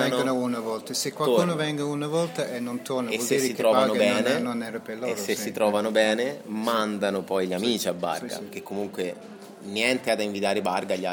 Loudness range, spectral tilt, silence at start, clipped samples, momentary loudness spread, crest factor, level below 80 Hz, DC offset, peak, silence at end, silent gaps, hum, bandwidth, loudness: 4 LU; -4 dB/octave; 0 s; under 0.1%; 11 LU; 20 dB; -74 dBFS; under 0.1%; -6 dBFS; 0 s; none; none; 17.5 kHz; -26 LUFS